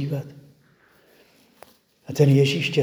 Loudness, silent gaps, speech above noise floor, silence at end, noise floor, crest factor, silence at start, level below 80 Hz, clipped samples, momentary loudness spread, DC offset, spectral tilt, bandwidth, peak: -20 LUFS; none; 38 dB; 0 s; -58 dBFS; 20 dB; 0 s; -66 dBFS; under 0.1%; 17 LU; under 0.1%; -6.5 dB/octave; 20 kHz; -4 dBFS